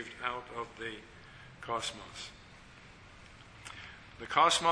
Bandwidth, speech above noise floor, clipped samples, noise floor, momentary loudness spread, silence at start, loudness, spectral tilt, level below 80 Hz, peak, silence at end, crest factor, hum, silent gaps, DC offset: 11 kHz; 21 dB; under 0.1%; -54 dBFS; 25 LU; 0 s; -34 LUFS; -2 dB/octave; -62 dBFS; -10 dBFS; 0 s; 26 dB; none; none; under 0.1%